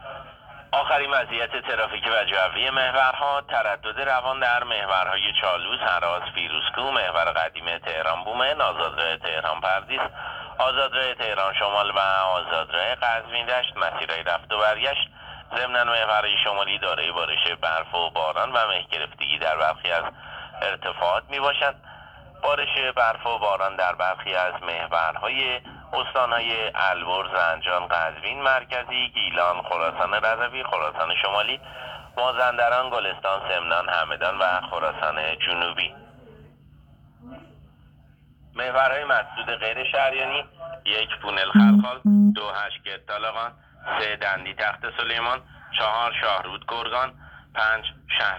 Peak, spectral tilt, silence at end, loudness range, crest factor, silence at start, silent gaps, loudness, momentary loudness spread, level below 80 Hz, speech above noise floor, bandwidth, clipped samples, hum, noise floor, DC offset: -4 dBFS; -5.5 dB/octave; 0 s; 4 LU; 20 dB; 0 s; none; -23 LUFS; 8 LU; -54 dBFS; 30 dB; 8.2 kHz; under 0.1%; none; -54 dBFS; under 0.1%